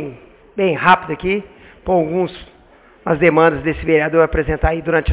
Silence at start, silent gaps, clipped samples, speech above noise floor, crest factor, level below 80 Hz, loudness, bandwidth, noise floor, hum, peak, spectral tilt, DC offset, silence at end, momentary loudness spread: 0 s; none; under 0.1%; 31 dB; 16 dB; -30 dBFS; -16 LUFS; 4 kHz; -47 dBFS; none; 0 dBFS; -10.5 dB/octave; under 0.1%; 0 s; 12 LU